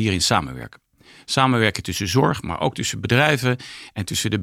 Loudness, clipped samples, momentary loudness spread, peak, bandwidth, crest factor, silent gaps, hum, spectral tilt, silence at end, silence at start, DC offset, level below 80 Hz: -20 LUFS; under 0.1%; 14 LU; -2 dBFS; 16.5 kHz; 20 dB; none; none; -4 dB/octave; 0 s; 0 s; under 0.1%; -50 dBFS